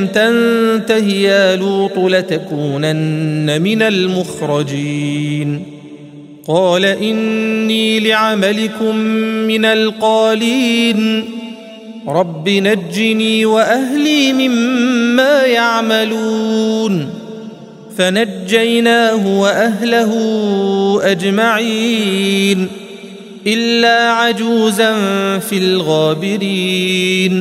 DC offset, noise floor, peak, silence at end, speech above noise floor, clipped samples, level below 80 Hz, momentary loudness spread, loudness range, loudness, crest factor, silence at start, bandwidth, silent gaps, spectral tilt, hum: under 0.1%; -34 dBFS; 0 dBFS; 0 s; 21 dB; under 0.1%; -62 dBFS; 8 LU; 3 LU; -13 LUFS; 14 dB; 0 s; 15.5 kHz; none; -5 dB/octave; none